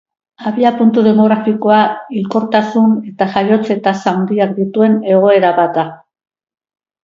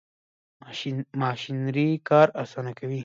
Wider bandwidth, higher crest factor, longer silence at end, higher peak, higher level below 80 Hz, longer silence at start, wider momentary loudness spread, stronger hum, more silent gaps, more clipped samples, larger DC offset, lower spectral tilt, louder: about the same, 7.2 kHz vs 7.6 kHz; second, 12 dB vs 22 dB; first, 1.1 s vs 0 s; first, 0 dBFS vs -4 dBFS; first, -60 dBFS vs -72 dBFS; second, 0.4 s vs 0.65 s; second, 7 LU vs 14 LU; neither; neither; neither; neither; about the same, -7.5 dB/octave vs -7.5 dB/octave; first, -13 LUFS vs -25 LUFS